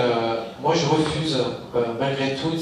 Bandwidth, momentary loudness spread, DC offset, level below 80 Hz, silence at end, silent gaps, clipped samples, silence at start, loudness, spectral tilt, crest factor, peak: 11.5 kHz; 5 LU; under 0.1%; -52 dBFS; 0 s; none; under 0.1%; 0 s; -23 LUFS; -5.5 dB/octave; 16 dB; -6 dBFS